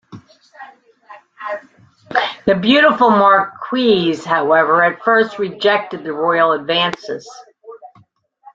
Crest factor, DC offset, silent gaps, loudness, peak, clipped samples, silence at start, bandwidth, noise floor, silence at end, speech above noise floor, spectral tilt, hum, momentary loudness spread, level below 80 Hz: 16 dB; under 0.1%; none; -14 LUFS; 0 dBFS; under 0.1%; 0.1 s; 7.8 kHz; -53 dBFS; 0.7 s; 38 dB; -5.5 dB/octave; none; 16 LU; -60 dBFS